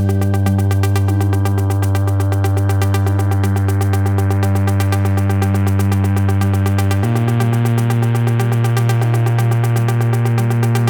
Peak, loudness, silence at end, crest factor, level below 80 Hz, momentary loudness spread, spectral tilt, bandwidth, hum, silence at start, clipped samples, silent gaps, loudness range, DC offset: -2 dBFS; -16 LUFS; 0 s; 12 dB; -52 dBFS; 1 LU; -7 dB/octave; 19 kHz; none; 0 s; under 0.1%; none; 1 LU; under 0.1%